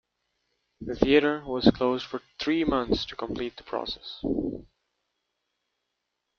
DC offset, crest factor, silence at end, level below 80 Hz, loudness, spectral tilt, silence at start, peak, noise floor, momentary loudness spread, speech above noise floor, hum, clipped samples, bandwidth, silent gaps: under 0.1%; 26 dB; 1.75 s; -48 dBFS; -27 LUFS; -6.5 dB/octave; 0.8 s; -4 dBFS; -82 dBFS; 13 LU; 55 dB; 60 Hz at -60 dBFS; under 0.1%; 6.8 kHz; none